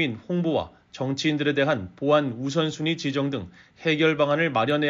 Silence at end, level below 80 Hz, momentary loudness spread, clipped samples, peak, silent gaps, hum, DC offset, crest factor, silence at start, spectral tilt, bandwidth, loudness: 0 s; -62 dBFS; 8 LU; under 0.1%; -8 dBFS; none; none; under 0.1%; 16 dB; 0 s; -4 dB/octave; 7.6 kHz; -24 LUFS